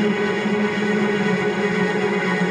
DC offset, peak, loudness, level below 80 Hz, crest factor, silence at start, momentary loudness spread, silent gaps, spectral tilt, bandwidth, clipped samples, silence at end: under 0.1%; -8 dBFS; -20 LUFS; -60 dBFS; 12 dB; 0 s; 1 LU; none; -6 dB/octave; 10 kHz; under 0.1%; 0 s